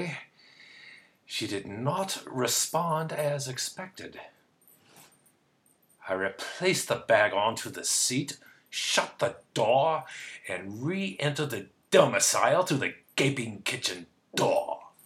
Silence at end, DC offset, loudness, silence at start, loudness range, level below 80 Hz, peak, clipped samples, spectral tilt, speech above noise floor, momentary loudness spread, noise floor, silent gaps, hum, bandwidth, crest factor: 0.2 s; under 0.1%; -28 LUFS; 0 s; 8 LU; -76 dBFS; -6 dBFS; under 0.1%; -3 dB/octave; 39 dB; 16 LU; -67 dBFS; none; none; 17.5 kHz; 24 dB